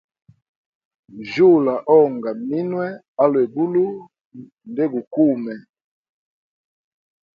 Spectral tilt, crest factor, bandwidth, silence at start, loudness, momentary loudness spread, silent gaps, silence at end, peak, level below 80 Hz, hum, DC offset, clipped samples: -9 dB/octave; 18 dB; 6.8 kHz; 1.15 s; -19 LUFS; 16 LU; 3.08-3.15 s, 4.25-4.30 s, 5.07-5.11 s; 1.75 s; -2 dBFS; -68 dBFS; none; under 0.1%; under 0.1%